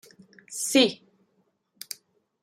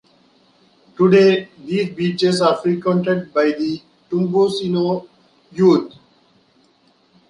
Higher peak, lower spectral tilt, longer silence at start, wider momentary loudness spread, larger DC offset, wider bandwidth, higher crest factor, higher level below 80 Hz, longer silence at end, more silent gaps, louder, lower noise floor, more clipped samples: second, -8 dBFS vs -2 dBFS; second, -2 dB/octave vs -6.5 dB/octave; second, 0.5 s vs 1 s; first, 23 LU vs 11 LU; neither; first, 16 kHz vs 11 kHz; first, 22 dB vs 16 dB; second, -78 dBFS vs -62 dBFS; about the same, 1.45 s vs 1.4 s; neither; second, -23 LUFS vs -17 LUFS; first, -71 dBFS vs -57 dBFS; neither